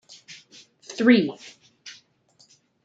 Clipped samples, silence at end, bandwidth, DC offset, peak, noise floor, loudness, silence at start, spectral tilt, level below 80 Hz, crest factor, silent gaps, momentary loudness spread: under 0.1%; 0.95 s; 8 kHz; under 0.1%; -4 dBFS; -61 dBFS; -20 LUFS; 0.3 s; -5 dB/octave; -76 dBFS; 22 dB; none; 27 LU